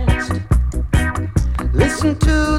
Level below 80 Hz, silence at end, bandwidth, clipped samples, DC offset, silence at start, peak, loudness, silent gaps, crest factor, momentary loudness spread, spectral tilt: -20 dBFS; 0 s; 13 kHz; under 0.1%; under 0.1%; 0 s; -2 dBFS; -18 LUFS; none; 14 dB; 4 LU; -6 dB/octave